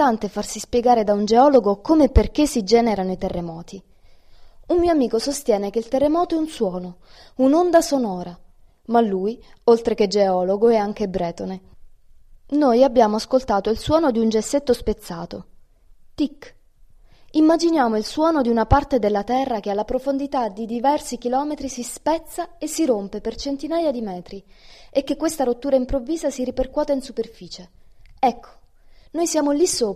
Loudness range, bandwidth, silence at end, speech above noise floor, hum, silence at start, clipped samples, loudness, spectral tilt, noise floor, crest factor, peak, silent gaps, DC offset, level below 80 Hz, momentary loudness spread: 5 LU; 15.5 kHz; 0 s; 29 dB; none; 0 s; under 0.1%; -20 LUFS; -5.5 dB/octave; -49 dBFS; 18 dB; -2 dBFS; none; under 0.1%; -36 dBFS; 14 LU